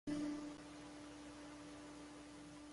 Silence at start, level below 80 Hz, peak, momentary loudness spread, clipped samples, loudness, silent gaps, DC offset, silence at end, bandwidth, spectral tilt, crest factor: 0.05 s; -72 dBFS; -34 dBFS; 11 LU; under 0.1%; -52 LUFS; none; under 0.1%; 0 s; 11.5 kHz; -4.5 dB/octave; 16 dB